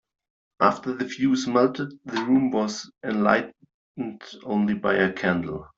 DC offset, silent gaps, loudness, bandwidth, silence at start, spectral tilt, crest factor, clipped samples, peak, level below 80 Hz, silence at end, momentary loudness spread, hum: under 0.1%; 3.74-3.95 s; -24 LUFS; 7.8 kHz; 0.6 s; -5.5 dB/octave; 20 dB; under 0.1%; -4 dBFS; -62 dBFS; 0.1 s; 13 LU; none